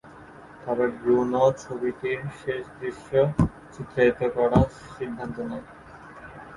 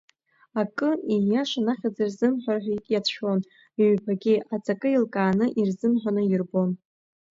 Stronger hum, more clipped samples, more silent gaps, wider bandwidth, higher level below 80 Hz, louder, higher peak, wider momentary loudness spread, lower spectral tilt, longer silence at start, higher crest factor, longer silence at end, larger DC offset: neither; neither; neither; first, 11.5 kHz vs 7.6 kHz; first, -44 dBFS vs -68 dBFS; about the same, -25 LUFS vs -25 LUFS; first, -4 dBFS vs -10 dBFS; first, 21 LU vs 6 LU; about the same, -7.5 dB/octave vs -7 dB/octave; second, 0.05 s vs 0.55 s; first, 20 dB vs 14 dB; second, 0 s vs 0.6 s; neither